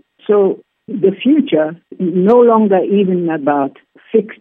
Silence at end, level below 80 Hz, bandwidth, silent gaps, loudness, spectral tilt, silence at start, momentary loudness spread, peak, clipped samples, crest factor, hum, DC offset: 0.05 s; -68 dBFS; 3.9 kHz; none; -14 LUFS; -10.5 dB/octave; 0.3 s; 12 LU; 0 dBFS; under 0.1%; 14 dB; none; under 0.1%